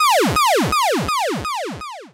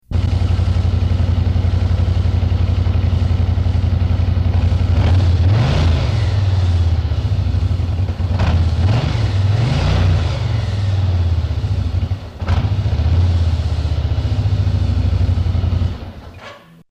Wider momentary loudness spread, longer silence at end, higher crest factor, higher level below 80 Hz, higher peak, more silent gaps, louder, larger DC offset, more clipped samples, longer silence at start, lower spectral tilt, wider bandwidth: first, 12 LU vs 5 LU; second, 0.05 s vs 0.3 s; about the same, 10 dB vs 8 dB; second, -42 dBFS vs -24 dBFS; about the same, -8 dBFS vs -8 dBFS; neither; about the same, -18 LUFS vs -17 LUFS; neither; neither; about the same, 0 s vs 0.1 s; second, -3.5 dB/octave vs -7.5 dB/octave; first, 16 kHz vs 7.6 kHz